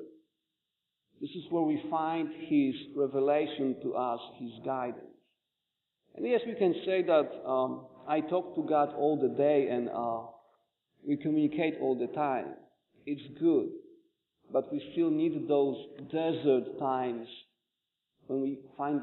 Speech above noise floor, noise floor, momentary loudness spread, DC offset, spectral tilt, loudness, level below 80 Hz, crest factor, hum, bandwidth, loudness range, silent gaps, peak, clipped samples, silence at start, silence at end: 56 dB; -86 dBFS; 13 LU; under 0.1%; -5.5 dB/octave; -31 LUFS; -80 dBFS; 18 dB; none; 4.2 kHz; 4 LU; none; -14 dBFS; under 0.1%; 0 s; 0 s